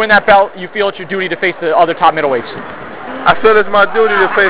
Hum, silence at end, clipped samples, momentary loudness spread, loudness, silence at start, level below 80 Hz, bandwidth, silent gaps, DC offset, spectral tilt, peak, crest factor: none; 0 s; under 0.1%; 16 LU; -11 LUFS; 0 s; -46 dBFS; 4 kHz; none; under 0.1%; -8 dB/octave; 0 dBFS; 12 dB